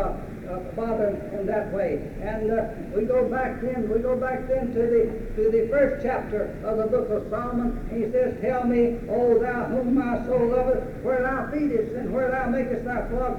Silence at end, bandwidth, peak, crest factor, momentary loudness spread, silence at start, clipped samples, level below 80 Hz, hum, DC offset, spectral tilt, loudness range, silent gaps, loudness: 0 s; 11 kHz; -8 dBFS; 16 dB; 7 LU; 0 s; under 0.1%; -38 dBFS; none; under 0.1%; -8.5 dB/octave; 3 LU; none; -25 LUFS